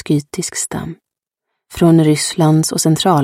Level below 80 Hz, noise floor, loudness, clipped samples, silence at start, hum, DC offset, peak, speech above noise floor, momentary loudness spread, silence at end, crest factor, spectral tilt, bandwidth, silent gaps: -48 dBFS; -79 dBFS; -14 LUFS; under 0.1%; 0.05 s; none; under 0.1%; 0 dBFS; 65 dB; 14 LU; 0 s; 14 dB; -5 dB/octave; 15.5 kHz; none